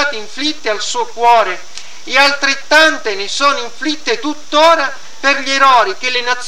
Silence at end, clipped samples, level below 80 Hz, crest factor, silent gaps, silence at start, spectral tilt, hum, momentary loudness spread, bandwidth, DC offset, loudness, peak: 0 s; 0.3%; -58 dBFS; 14 dB; none; 0 s; -0.5 dB/octave; none; 10 LU; 16.5 kHz; 6%; -13 LUFS; 0 dBFS